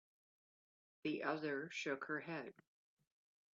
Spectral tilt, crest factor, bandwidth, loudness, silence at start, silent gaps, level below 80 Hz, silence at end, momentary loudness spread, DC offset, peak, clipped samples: -3.5 dB/octave; 22 dB; 7.4 kHz; -44 LUFS; 1.05 s; none; under -90 dBFS; 1 s; 7 LU; under 0.1%; -26 dBFS; under 0.1%